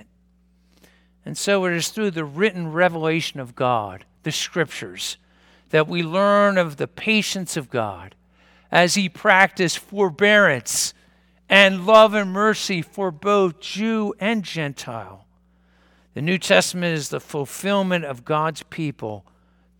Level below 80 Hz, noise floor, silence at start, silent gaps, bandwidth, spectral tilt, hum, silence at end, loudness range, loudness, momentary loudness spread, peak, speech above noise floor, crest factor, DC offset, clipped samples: -62 dBFS; -59 dBFS; 1.25 s; none; 19 kHz; -4 dB/octave; none; 0.6 s; 7 LU; -20 LUFS; 15 LU; 0 dBFS; 39 dB; 22 dB; under 0.1%; under 0.1%